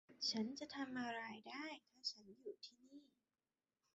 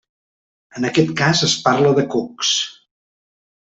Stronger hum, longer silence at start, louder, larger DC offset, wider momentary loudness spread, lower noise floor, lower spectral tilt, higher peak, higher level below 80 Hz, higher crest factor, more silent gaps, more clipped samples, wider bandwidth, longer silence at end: neither; second, 0.1 s vs 0.75 s; second, -48 LUFS vs -17 LUFS; neither; first, 17 LU vs 9 LU; about the same, under -90 dBFS vs under -90 dBFS; second, -1.5 dB/octave vs -4 dB/octave; second, -30 dBFS vs -2 dBFS; second, under -90 dBFS vs -58 dBFS; about the same, 20 dB vs 18 dB; neither; neither; about the same, 8 kHz vs 8.4 kHz; about the same, 0.9 s vs 1 s